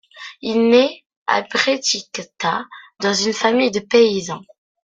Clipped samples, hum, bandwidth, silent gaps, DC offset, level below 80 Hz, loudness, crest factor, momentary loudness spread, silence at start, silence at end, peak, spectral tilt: under 0.1%; none; 9.2 kHz; 1.06-1.10 s, 1.17-1.26 s; under 0.1%; -62 dBFS; -18 LUFS; 18 dB; 15 LU; 0.15 s; 0.45 s; -2 dBFS; -3 dB/octave